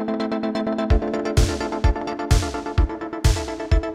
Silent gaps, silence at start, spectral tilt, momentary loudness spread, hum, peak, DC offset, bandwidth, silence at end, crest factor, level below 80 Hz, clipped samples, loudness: none; 0 s; -6 dB/octave; 3 LU; none; -4 dBFS; under 0.1%; 15 kHz; 0 s; 16 dB; -24 dBFS; under 0.1%; -23 LUFS